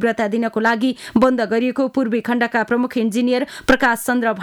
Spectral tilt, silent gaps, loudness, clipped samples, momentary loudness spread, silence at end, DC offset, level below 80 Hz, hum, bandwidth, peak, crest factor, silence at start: -5 dB/octave; none; -18 LUFS; under 0.1%; 4 LU; 0 s; under 0.1%; -48 dBFS; none; 18 kHz; -4 dBFS; 14 dB; 0 s